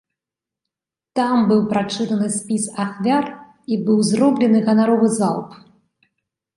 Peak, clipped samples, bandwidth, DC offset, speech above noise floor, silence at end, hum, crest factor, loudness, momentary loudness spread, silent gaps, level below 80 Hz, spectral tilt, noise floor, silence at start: -4 dBFS; under 0.1%; 11.5 kHz; under 0.1%; 70 dB; 1 s; none; 16 dB; -18 LUFS; 11 LU; none; -64 dBFS; -5.5 dB/octave; -87 dBFS; 1.15 s